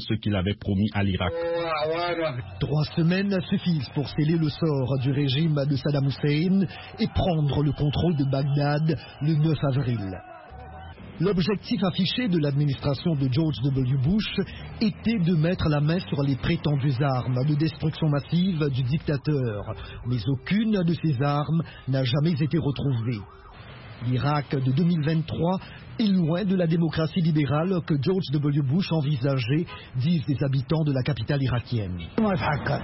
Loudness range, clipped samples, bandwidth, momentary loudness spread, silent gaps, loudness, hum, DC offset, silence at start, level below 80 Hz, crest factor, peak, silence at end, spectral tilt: 2 LU; under 0.1%; 5.8 kHz; 7 LU; none; -25 LUFS; none; under 0.1%; 0 s; -46 dBFS; 14 dB; -10 dBFS; 0 s; -11.5 dB/octave